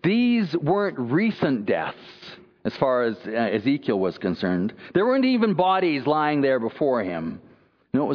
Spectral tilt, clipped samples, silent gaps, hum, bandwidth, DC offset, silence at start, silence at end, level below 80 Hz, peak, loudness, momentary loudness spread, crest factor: -8.5 dB/octave; under 0.1%; none; none; 5.4 kHz; under 0.1%; 0.05 s; 0 s; -64 dBFS; -6 dBFS; -23 LUFS; 12 LU; 16 dB